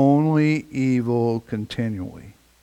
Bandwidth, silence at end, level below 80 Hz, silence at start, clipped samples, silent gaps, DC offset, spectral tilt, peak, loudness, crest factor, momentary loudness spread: 10.5 kHz; 0.3 s; -56 dBFS; 0 s; under 0.1%; none; under 0.1%; -8 dB/octave; -6 dBFS; -22 LUFS; 16 dB; 11 LU